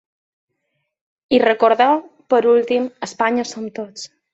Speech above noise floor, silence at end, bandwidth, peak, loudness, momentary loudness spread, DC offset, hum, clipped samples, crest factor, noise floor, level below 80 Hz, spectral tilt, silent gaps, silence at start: 56 dB; 0.25 s; 8 kHz; -2 dBFS; -17 LUFS; 15 LU; under 0.1%; none; under 0.1%; 16 dB; -73 dBFS; -64 dBFS; -4 dB/octave; none; 1.3 s